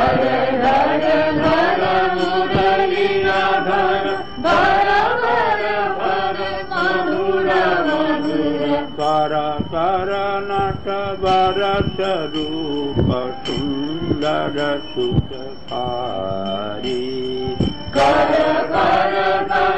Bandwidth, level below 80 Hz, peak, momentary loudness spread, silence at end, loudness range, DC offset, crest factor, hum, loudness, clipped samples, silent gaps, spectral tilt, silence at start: 9 kHz; -40 dBFS; -6 dBFS; 8 LU; 0 s; 6 LU; 2%; 12 dB; none; -18 LUFS; under 0.1%; none; -6.5 dB/octave; 0 s